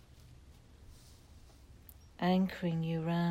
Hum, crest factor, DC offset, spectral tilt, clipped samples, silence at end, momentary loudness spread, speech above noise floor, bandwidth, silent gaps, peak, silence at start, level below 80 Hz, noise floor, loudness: none; 16 dB; under 0.1%; -8 dB/octave; under 0.1%; 0 s; 25 LU; 25 dB; 16 kHz; none; -20 dBFS; 0.15 s; -60 dBFS; -57 dBFS; -34 LUFS